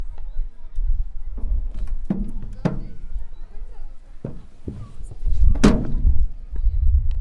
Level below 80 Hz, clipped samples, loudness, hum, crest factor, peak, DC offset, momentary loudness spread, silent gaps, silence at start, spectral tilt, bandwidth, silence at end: -22 dBFS; under 0.1%; -25 LUFS; none; 18 dB; -2 dBFS; under 0.1%; 20 LU; none; 0 s; -7 dB/octave; 10.5 kHz; 0 s